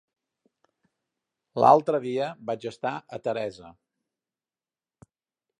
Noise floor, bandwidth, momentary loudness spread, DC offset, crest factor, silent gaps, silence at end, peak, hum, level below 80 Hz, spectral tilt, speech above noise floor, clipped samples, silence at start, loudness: under -90 dBFS; 10.5 kHz; 14 LU; under 0.1%; 24 dB; none; 1.9 s; -4 dBFS; none; -74 dBFS; -6.5 dB/octave; over 65 dB; under 0.1%; 1.55 s; -25 LUFS